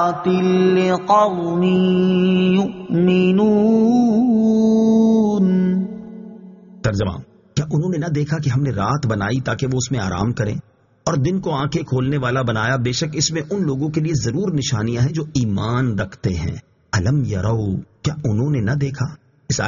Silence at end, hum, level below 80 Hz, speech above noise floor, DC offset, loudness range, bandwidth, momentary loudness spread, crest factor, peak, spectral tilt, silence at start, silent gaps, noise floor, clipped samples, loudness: 0 s; none; -44 dBFS; 22 dB; under 0.1%; 6 LU; 7.4 kHz; 10 LU; 14 dB; -4 dBFS; -6.5 dB/octave; 0 s; none; -40 dBFS; under 0.1%; -18 LUFS